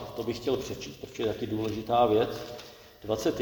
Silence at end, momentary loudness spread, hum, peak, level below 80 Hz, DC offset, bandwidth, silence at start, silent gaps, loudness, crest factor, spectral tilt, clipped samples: 0 s; 17 LU; none; -12 dBFS; -56 dBFS; under 0.1%; 19.5 kHz; 0 s; none; -30 LUFS; 18 dB; -5.5 dB/octave; under 0.1%